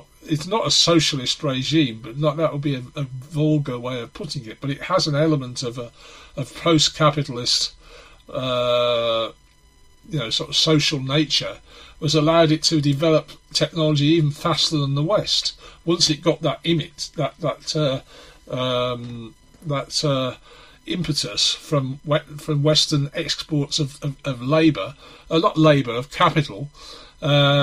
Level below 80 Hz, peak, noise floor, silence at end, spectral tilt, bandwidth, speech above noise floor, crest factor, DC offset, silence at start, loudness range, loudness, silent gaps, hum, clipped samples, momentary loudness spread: -50 dBFS; -2 dBFS; -52 dBFS; 0 s; -4.5 dB/octave; 15 kHz; 31 dB; 20 dB; under 0.1%; 0.25 s; 5 LU; -20 LUFS; none; none; under 0.1%; 14 LU